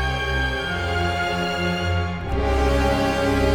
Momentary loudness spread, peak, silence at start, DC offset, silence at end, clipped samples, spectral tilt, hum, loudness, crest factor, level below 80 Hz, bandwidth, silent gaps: 4 LU; -6 dBFS; 0 s; under 0.1%; 0 s; under 0.1%; -5.5 dB/octave; none; -22 LUFS; 14 dB; -28 dBFS; 18 kHz; none